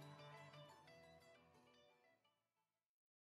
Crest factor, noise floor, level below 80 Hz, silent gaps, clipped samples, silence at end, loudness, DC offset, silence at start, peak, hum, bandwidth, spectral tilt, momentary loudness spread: 18 dB; under -90 dBFS; under -90 dBFS; none; under 0.1%; 0.6 s; -63 LUFS; under 0.1%; 0 s; -48 dBFS; none; 13 kHz; -5 dB/octave; 8 LU